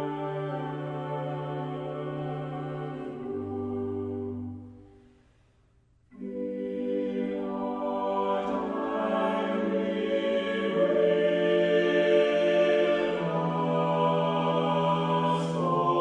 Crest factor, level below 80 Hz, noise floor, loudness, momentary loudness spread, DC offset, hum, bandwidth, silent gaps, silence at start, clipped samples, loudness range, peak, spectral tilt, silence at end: 16 dB; -64 dBFS; -64 dBFS; -28 LUFS; 11 LU; under 0.1%; none; 9.8 kHz; none; 0 s; under 0.1%; 12 LU; -12 dBFS; -7.5 dB/octave; 0 s